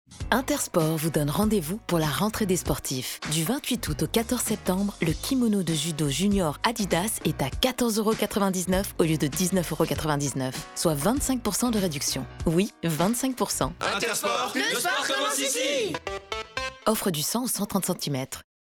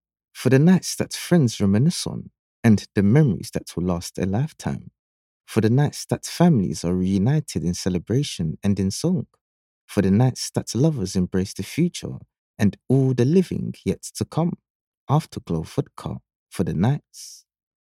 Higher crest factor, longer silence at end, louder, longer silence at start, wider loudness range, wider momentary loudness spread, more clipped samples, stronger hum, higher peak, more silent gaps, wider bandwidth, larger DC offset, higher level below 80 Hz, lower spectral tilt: about the same, 18 dB vs 18 dB; second, 0.3 s vs 0.45 s; second, -26 LUFS vs -22 LUFS; second, 0.1 s vs 0.35 s; second, 1 LU vs 5 LU; second, 4 LU vs 12 LU; neither; neither; second, -8 dBFS vs -4 dBFS; second, none vs 2.39-2.63 s, 4.99-5.40 s, 9.41-9.88 s, 12.38-12.54 s, 14.70-15.07 s, 16.35-16.46 s; first, over 20 kHz vs 15.5 kHz; neither; first, -44 dBFS vs -50 dBFS; second, -4 dB/octave vs -6.5 dB/octave